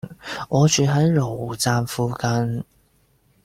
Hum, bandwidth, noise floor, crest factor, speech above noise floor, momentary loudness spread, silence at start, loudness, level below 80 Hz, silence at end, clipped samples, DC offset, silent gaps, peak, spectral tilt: none; 16 kHz; -61 dBFS; 16 dB; 41 dB; 15 LU; 0.05 s; -21 LUFS; -52 dBFS; 0.8 s; under 0.1%; under 0.1%; none; -4 dBFS; -5 dB/octave